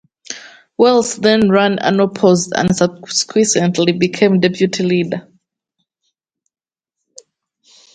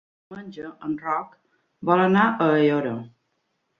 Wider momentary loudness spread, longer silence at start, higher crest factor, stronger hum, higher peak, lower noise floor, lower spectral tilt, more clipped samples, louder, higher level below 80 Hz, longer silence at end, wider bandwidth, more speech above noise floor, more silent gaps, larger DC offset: second, 14 LU vs 21 LU; about the same, 0.3 s vs 0.3 s; about the same, 16 dB vs 20 dB; neither; first, 0 dBFS vs -4 dBFS; first, -80 dBFS vs -74 dBFS; second, -4.5 dB/octave vs -8.5 dB/octave; neither; first, -14 LUFS vs -22 LUFS; first, -54 dBFS vs -66 dBFS; first, 2.75 s vs 0.7 s; first, 9.4 kHz vs 6.8 kHz; first, 66 dB vs 51 dB; neither; neither